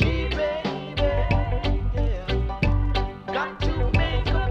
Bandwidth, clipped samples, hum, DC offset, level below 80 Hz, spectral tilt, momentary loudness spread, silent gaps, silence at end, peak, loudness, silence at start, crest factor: 7 kHz; under 0.1%; none; under 0.1%; -26 dBFS; -7 dB/octave; 5 LU; none; 0 s; -8 dBFS; -25 LUFS; 0 s; 16 dB